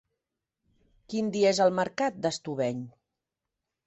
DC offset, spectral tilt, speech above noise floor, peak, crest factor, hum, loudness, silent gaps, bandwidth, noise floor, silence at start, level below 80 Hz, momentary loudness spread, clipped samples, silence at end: under 0.1%; -4.5 dB/octave; 59 dB; -12 dBFS; 18 dB; none; -28 LUFS; none; 8.4 kHz; -87 dBFS; 1.1 s; -70 dBFS; 13 LU; under 0.1%; 0.95 s